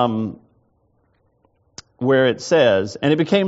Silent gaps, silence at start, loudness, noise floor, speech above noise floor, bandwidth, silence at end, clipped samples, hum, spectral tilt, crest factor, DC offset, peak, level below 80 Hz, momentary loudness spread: none; 0 s; -18 LUFS; -63 dBFS; 46 dB; 8 kHz; 0 s; under 0.1%; none; -4.5 dB/octave; 16 dB; under 0.1%; -2 dBFS; -62 dBFS; 10 LU